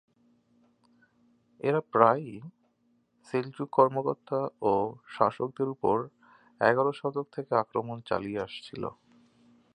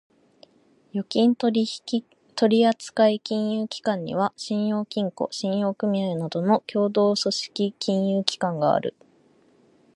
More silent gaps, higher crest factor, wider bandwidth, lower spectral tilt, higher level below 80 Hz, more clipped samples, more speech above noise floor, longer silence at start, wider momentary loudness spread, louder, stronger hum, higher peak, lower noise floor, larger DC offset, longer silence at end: neither; about the same, 26 dB vs 24 dB; second, 9.6 kHz vs 11.5 kHz; first, -7.5 dB/octave vs -5.5 dB/octave; about the same, -68 dBFS vs -72 dBFS; neither; first, 42 dB vs 36 dB; first, 1.65 s vs 0.95 s; first, 14 LU vs 8 LU; second, -29 LUFS vs -24 LUFS; neither; second, -4 dBFS vs 0 dBFS; first, -71 dBFS vs -59 dBFS; neither; second, 0.85 s vs 1.05 s